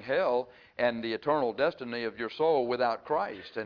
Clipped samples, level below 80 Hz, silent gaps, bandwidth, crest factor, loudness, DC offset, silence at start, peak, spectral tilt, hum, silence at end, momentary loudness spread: under 0.1%; -70 dBFS; none; 5.4 kHz; 16 dB; -30 LUFS; under 0.1%; 0 s; -14 dBFS; -7 dB/octave; none; 0 s; 8 LU